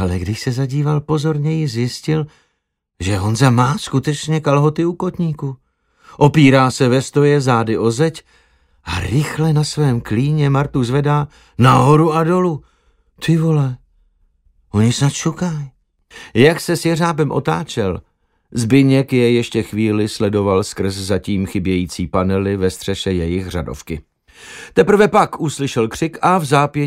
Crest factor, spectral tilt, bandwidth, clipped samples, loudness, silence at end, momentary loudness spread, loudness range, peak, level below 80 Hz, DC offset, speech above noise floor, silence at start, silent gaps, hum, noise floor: 16 dB; -6.5 dB/octave; 15 kHz; under 0.1%; -16 LUFS; 0 s; 11 LU; 4 LU; 0 dBFS; -42 dBFS; under 0.1%; 56 dB; 0 s; none; none; -72 dBFS